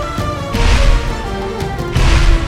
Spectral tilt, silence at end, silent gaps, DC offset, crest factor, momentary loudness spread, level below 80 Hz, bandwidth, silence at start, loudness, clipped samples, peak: -5 dB/octave; 0 s; none; under 0.1%; 12 dB; 8 LU; -14 dBFS; 13 kHz; 0 s; -16 LUFS; under 0.1%; 0 dBFS